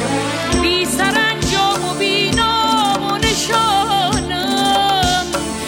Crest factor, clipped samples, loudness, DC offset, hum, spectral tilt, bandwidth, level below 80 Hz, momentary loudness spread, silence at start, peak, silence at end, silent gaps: 14 dB; under 0.1%; -15 LUFS; under 0.1%; none; -3 dB/octave; 17 kHz; -34 dBFS; 4 LU; 0 s; -2 dBFS; 0 s; none